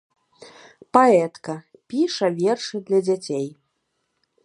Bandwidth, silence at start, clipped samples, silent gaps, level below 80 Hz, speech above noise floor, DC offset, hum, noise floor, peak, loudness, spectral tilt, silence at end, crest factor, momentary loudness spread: 11 kHz; 0.4 s; under 0.1%; none; -74 dBFS; 54 dB; under 0.1%; none; -74 dBFS; 0 dBFS; -21 LUFS; -5.5 dB/octave; 0.95 s; 22 dB; 17 LU